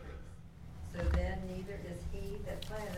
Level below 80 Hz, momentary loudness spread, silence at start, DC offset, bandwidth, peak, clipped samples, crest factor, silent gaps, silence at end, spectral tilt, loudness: -42 dBFS; 17 LU; 0 s; under 0.1%; 15.5 kHz; -22 dBFS; under 0.1%; 18 dB; none; 0 s; -6.5 dB/octave; -41 LUFS